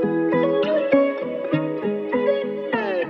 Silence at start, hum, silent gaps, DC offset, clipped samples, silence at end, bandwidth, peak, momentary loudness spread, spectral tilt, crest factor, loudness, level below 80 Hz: 0 s; none; none; under 0.1%; under 0.1%; 0 s; 5.8 kHz; -6 dBFS; 6 LU; -8.5 dB/octave; 16 dB; -22 LUFS; -66 dBFS